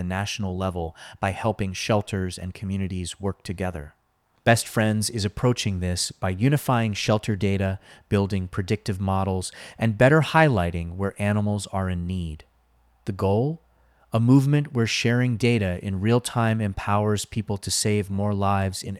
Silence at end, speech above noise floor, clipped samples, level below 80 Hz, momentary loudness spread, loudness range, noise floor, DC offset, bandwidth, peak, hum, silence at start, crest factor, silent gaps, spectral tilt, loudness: 0 s; 38 dB; under 0.1%; -48 dBFS; 11 LU; 5 LU; -62 dBFS; under 0.1%; 15 kHz; -4 dBFS; none; 0 s; 20 dB; none; -5.5 dB/octave; -24 LUFS